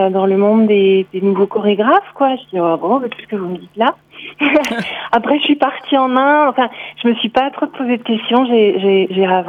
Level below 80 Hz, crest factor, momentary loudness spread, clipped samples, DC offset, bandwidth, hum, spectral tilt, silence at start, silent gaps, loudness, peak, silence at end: -60 dBFS; 14 dB; 8 LU; under 0.1%; under 0.1%; 11 kHz; none; -6.5 dB/octave; 0 s; none; -14 LUFS; 0 dBFS; 0 s